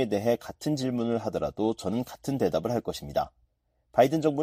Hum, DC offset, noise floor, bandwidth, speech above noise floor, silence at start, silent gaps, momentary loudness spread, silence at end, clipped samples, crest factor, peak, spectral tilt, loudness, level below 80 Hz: none; under 0.1%; -72 dBFS; 15.5 kHz; 45 dB; 0 s; none; 8 LU; 0 s; under 0.1%; 20 dB; -8 dBFS; -6.5 dB/octave; -29 LUFS; -56 dBFS